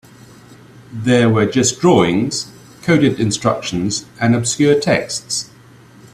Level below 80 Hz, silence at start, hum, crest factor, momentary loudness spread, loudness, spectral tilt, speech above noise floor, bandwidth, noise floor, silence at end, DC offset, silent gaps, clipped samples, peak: -50 dBFS; 0.5 s; none; 16 dB; 10 LU; -16 LUFS; -4.5 dB/octave; 28 dB; 14 kHz; -43 dBFS; 0.7 s; under 0.1%; none; under 0.1%; 0 dBFS